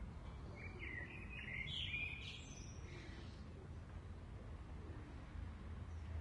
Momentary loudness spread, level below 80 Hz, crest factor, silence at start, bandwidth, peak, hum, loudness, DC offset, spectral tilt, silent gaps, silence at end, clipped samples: 11 LU; -56 dBFS; 18 dB; 0 s; 11 kHz; -32 dBFS; none; -50 LUFS; under 0.1%; -4.5 dB/octave; none; 0 s; under 0.1%